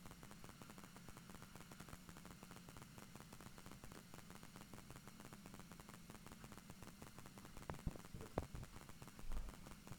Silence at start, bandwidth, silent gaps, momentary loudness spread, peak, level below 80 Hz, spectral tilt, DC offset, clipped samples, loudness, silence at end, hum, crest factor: 0 s; over 20 kHz; none; 7 LU; -24 dBFS; -60 dBFS; -4.5 dB/octave; under 0.1%; under 0.1%; -57 LUFS; 0 s; none; 30 dB